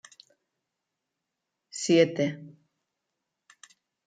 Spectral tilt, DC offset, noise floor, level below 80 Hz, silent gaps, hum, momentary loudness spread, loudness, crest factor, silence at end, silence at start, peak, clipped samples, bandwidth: -5 dB/octave; under 0.1%; -85 dBFS; -80 dBFS; none; none; 20 LU; -25 LUFS; 24 dB; 1.55 s; 1.75 s; -8 dBFS; under 0.1%; 9.4 kHz